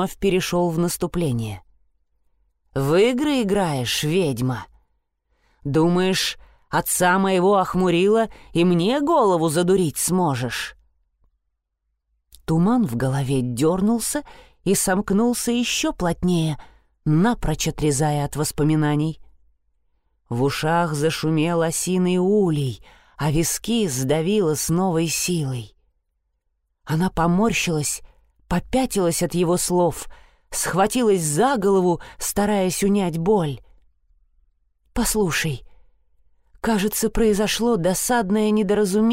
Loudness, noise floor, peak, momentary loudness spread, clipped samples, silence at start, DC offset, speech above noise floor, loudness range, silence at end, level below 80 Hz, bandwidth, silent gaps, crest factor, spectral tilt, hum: -21 LUFS; -76 dBFS; -8 dBFS; 9 LU; under 0.1%; 0 s; under 0.1%; 56 dB; 4 LU; 0 s; -42 dBFS; 16 kHz; none; 14 dB; -5 dB/octave; none